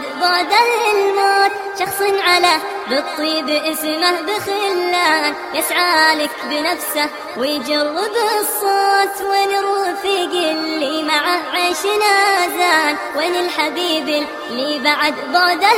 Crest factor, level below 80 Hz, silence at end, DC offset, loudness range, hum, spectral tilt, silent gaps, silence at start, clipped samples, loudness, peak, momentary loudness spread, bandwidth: 16 dB; -62 dBFS; 0 s; under 0.1%; 2 LU; none; -1 dB/octave; none; 0 s; under 0.1%; -16 LUFS; 0 dBFS; 7 LU; 16 kHz